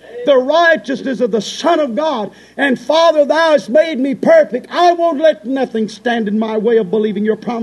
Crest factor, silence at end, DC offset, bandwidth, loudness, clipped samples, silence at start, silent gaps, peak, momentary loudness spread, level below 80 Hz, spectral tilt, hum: 12 dB; 0 s; under 0.1%; 11.5 kHz; -14 LUFS; under 0.1%; 0.05 s; none; 0 dBFS; 7 LU; -62 dBFS; -5 dB/octave; none